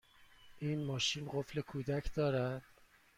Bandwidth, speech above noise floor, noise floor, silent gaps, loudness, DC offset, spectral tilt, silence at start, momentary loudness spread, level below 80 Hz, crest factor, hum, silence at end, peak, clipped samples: 15 kHz; 24 dB; -61 dBFS; none; -38 LUFS; under 0.1%; -5 dB/octave; 0.2 s; 6 LU; -56 dBFS; 16 dB; none; 0.55 s; -24 dBFS; under 0.1%